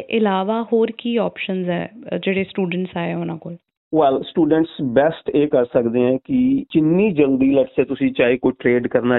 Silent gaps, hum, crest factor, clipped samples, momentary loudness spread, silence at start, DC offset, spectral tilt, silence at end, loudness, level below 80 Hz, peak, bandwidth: 3.77-3.91 s; none; 16 dB; under 0.1%; 8 LU; 0 s; under 0.1%; -5.5 dB/octave; 0 s; -19 LUFS; -54 dBFS; -2 dBFS; 4.1 kHz